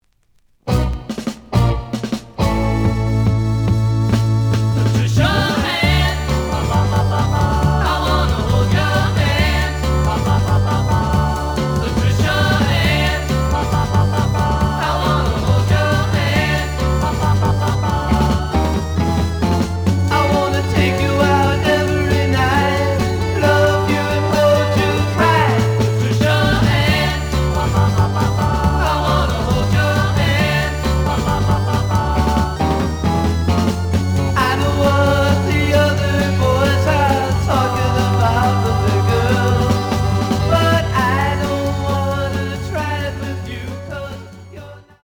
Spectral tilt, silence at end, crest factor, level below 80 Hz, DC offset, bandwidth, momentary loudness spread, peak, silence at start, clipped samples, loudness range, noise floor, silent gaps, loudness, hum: -6 dB/octave; 0.25 s; 14 dB; -26 dBFS; under 0.1%; 20 kHz; 5 LU; -2 dBFS; 0.65 s; under 0.1%; 2 LU; -56 dBFS; none; -16 LUFS; none